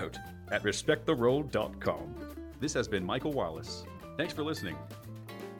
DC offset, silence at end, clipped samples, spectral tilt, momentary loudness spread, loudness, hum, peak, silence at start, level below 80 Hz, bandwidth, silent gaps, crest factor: under 0.1%; 0 s; under 0.1%; -5 dB/octave; 16 LU; -33 LUFS; none; -14 dBFS; 0 s; -54 dBFS; 18 kHz; none; 20 dB